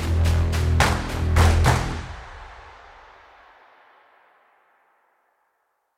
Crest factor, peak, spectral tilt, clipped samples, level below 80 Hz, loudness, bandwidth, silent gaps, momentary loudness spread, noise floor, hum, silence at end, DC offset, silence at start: 20 dB; -4 dBFS; -5.5 dB/octave; under 0.1%; -28 dBFS; -21 LUFS; 15 kHz; none; 24 LU; -72 dBFS; 50 Hz at -55 dBFS; 3.3 s; under 0.1%; 0 s